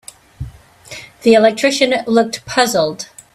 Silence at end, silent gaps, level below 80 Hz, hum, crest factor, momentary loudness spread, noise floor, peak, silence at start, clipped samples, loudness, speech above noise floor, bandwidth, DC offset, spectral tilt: 0.3 s; none; -44 dBFS; none; 16 dB; 22 LU; -37 dBFS; 0 dBFS; 0.4 s; under 0.1%; -14 LUFS; 23 dB; 15.5 kHz; under 0.1%; -3.5 dB/octave